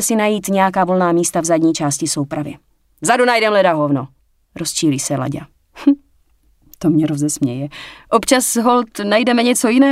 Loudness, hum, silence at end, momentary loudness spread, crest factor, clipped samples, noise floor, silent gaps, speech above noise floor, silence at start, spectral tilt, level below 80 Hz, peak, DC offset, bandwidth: -16 LUFS; none; 0 s; 11 LU; 16 dB; under 0.1%; -56 dBFS; none; 40 dB; 0 s; -4 dB/octave; -54 dBFS; 0 dBFS; under 0.1%; 16 kHz